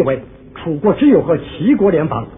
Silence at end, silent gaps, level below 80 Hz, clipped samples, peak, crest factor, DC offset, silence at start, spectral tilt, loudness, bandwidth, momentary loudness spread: 0.05 s; none; -42 dBFS; under 0.1%; -2 dBFS; 14 dB; under 0.1%; 0 s; -12 dB/octave; -14 LUFS; 3.8 kHz; 12 LU